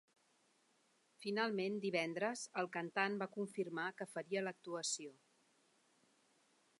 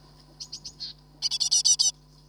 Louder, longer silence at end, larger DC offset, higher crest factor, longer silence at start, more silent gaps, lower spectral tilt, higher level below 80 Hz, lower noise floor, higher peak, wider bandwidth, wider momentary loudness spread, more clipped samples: second, -41 LUFS vs -22 LUFS; first, 1.65 s vs 0.35 s; neither; about the same, 22 dB vs 20 dB; first, 1.2 s vs 0.4 s; neither; first, -3.5 dB/octave vs 2 dB/octave; second, under -90 dBFS vs -60 dBFS; first, -77 dBFS vs -46 dBFS; second, -22 dBFS vs -8 dBFS; second, 11.5 kHz vs over 20 kHz; second, 6 LU vs 20 LU; neither